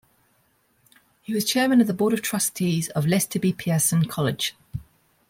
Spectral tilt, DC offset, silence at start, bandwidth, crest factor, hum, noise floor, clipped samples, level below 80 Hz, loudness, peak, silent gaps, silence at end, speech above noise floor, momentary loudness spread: -4.5 dB/octave; under 0.1%; 1.3 s; 16.5 kHz; 16 dB; none; -65 dBFS; under 0.1%; -58 dBFS; -23 LUFS; -8 dBFS; none; 0.5 s; 43 dB; 12 LU